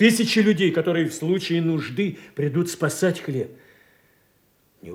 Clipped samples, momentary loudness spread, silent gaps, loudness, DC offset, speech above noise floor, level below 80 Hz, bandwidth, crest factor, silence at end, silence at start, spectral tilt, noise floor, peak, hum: under 0.1%; 9 LU; none; -22 LUFS; under 0.1%; 41 dB; -68 dBFS; 16.5 kHz; 18 dB; 0 s; 0 s; -5 dB/octave; -63 dBFS; -4 dBFS; none